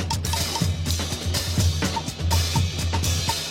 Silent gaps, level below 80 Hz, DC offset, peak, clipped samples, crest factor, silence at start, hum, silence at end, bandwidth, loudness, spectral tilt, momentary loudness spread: none; -34 dBFS; under 0.1%; -8 dBFS; under 0.1%; 14 dB; 0 s; none; 0 s; 16.5 kHz; -24 LUFS; -3.5 dB/octave; 3 LU